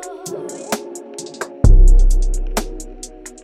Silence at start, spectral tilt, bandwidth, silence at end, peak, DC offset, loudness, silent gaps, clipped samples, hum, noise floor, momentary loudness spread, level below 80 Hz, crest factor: 0 s; -5.5 dB/octave; 12.5 kHz; 0.15 s; 0 dBFS; under 0.1%; -19 LUFS; none; under 0.1%; none; -35 dBFS; 19 LU; -14 dBFS; 14 dB